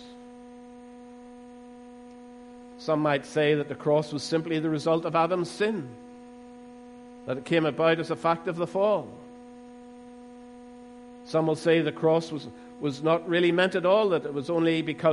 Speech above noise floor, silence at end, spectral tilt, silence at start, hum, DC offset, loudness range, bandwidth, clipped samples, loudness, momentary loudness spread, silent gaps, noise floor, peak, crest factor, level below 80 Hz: 21 dB; 0 s; -6 dB/octave; 0 s; none; under 0.1%; 6 LU; 11.5 kHz; under 0.1%; -26 LUFS; 24 LU; none; -46 dBFS; -10 dBFS; 18 dB; -68 dBFS